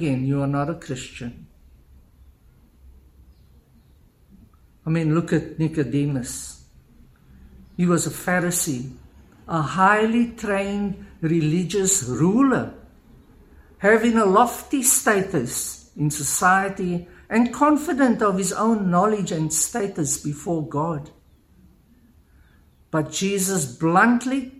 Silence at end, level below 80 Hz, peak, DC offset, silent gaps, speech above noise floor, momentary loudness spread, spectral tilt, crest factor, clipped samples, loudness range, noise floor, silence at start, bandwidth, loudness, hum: 0 s; -52 dBFS; -2 dBFS; under 0.1%; none; 34 dB; 12 LU; -4.5 dB/octave; 20 dB; under 0.1%; 9 LU; -55 dBFS; 0 s; 16 kHz; -21 LUFS; none